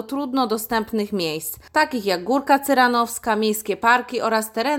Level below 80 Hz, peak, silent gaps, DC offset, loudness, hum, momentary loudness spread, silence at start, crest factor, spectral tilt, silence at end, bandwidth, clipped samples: -56 dBFS; -4 dBFS; none; under 0.1%; -21 LUFS; none; 7 LU; 0 s; 18 dB; -3.5 dB/octave; 0 s; 17.5 kHz; under 0.1%